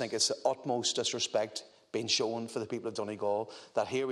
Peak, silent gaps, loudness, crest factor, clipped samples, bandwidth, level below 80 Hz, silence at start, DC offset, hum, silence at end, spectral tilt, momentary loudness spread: -14 dBFS; none; -33 LUFS; 18 dB; under 0.1%; 13 kHz; -80 dBFS; 0 s; under 0.1%; none; 0 s; -2.5 dB/octave; 8 LU